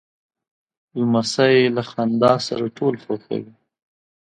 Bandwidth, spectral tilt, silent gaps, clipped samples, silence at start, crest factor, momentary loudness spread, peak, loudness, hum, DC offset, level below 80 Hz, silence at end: 10 kHz; -5.5 dB/octave; none; under 0.1%; 0.95 s; 18 dB; 13 LU; -2 dBFS; -20 LUFS; none; under 0.1%; -62 dBFS; 0.9 s